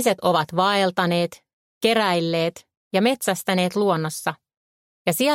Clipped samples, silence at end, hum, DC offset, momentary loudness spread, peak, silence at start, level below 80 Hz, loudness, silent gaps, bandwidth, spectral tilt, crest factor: under 0.1%; 0 s; none; under 0.1%; 8 LU; -4 dBFS; 0 s; -68 dBFS; -22 LUFS; 1.53-1.81 s, 2.77-2.91 s, 4.57-5.05 s; 16.5 kHz; -4.5 dB/octave; 18 dB